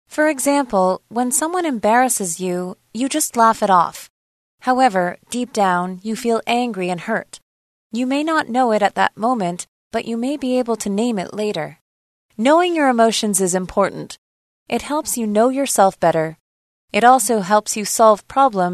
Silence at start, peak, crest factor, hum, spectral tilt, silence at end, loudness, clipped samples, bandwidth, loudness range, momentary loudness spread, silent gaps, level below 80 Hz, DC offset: 0.1 s; 0 dBFS; 18 dB; none; -3.5 dB/octave; 0 s; -18 LUFS; under 0.1%; 13.5 kHz; 4 LU; 11 LU; 4.10-4.58 s, 7.42-7.90 s, 9.68-9.91 s, 11.81-12.29 s, 14.18-14.66 s, 16.40-16.88 s; -56 dBFS; under 0.1%